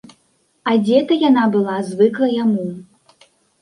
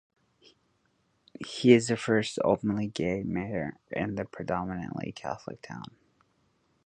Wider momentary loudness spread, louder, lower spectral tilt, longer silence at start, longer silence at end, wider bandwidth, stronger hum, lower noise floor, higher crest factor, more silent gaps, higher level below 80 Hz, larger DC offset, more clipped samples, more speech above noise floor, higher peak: second, 11 LU vs 20 LU; first, -16 LUFS vs -29 LUFS; about the same, -7 dB/octave vs -6 dB/octave; second, 0.65 s vs 1.4 s; second, 0.8 s vs 1.05 s; first, 11 kHz vs 9.8 kHz; neither; second, -62 dBFS vs -72 dBFS; second, 16 dB vs 24 dB; neither; second, -66 dBFS vs -58 dBFS; neither; neither; about the same, 46 dB vs 43 dB; first, -2 dBFS vs -6 dBFS